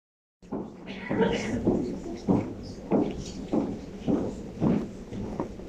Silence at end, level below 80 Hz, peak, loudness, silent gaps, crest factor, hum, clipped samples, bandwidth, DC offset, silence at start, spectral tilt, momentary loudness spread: 0 s; -48 dBFS; -10 dBFS; -30 LUFS; none; 20 dB; none; under 0.1%; 9.8 kHz; under 0.1%; 0.4 s; -7 dB/octave; 11 LU